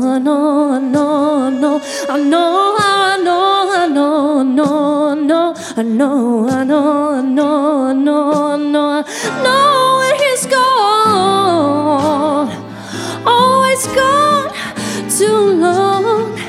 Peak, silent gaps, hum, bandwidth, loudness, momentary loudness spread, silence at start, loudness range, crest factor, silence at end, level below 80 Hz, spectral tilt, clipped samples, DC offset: 0 dBFS; none; none; 15.5 kHz; -13 LUFS; 7 LU; 0 s; 2 LU; 12 dB; 0 s; -54 dBFS; -4 dB/octave; under 0.1%; under 0.1%